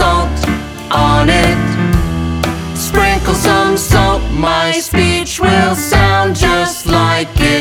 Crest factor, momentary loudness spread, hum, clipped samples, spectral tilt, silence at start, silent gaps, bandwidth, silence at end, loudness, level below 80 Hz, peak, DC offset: 12 dB; 7 LU; none; under 0.1%; -4.5 dB/octave; 0 s; none; 19 kHz; 0 s; -12 LUFS; -22 dBFS; 0 dBFS; under 0.1%